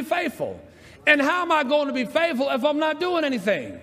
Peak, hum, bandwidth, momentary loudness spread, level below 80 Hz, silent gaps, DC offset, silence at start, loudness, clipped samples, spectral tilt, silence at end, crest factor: -2 dBFS; none; 15.5 kHz; 9 LU; -66 dBFS; none; under 0.1%; 0 s; -22 LUFS; under 0.1%; -4.5 dB/octave; 0 s; 20 dB